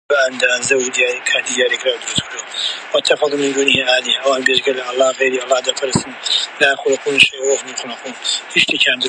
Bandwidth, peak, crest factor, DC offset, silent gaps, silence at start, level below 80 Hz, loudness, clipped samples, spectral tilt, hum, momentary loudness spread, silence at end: 11.5 kHz; 0 dBFS; 16 dB; under 0.1%; none; 0.1 s; -54 dBFS; -15 LUFS; under 0.1%; -1.5 dB/octave; none; 8 LU; 0 s